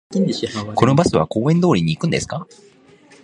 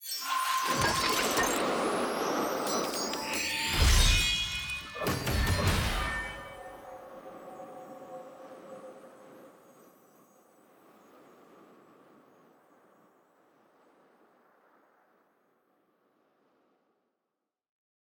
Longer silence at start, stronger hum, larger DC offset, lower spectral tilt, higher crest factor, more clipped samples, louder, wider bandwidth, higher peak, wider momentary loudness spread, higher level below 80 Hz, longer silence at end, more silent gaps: about the same, 0.1 s vs 0 s; neither; neither; first, -6.5 dB/octave vs -3 dB/octave; about the same, 18 dB vs 22 dB; neither; first, -18 LUFS vs -29 LUFS; second, 10.5 kHz vs over 20 kHz; first, 0 dBFS vs -12 dBFS; second, 9 LU vs 22 LU; second, -46 dBFS vs -40 dBFS; second, 0.8 s vs 8.5 s; neither